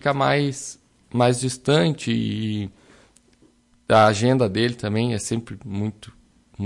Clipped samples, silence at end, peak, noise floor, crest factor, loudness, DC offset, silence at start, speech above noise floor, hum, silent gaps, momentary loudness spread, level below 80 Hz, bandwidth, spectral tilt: under 0.1%; 0 s; -4 dBFS; -58 dBFS; 18 dB; -21 LUFS; under 0.1%; 0.05 s; 37 dB; none; none; 14 LU; -56 dBFS; 11.5 kHz; -5.5 dB/octave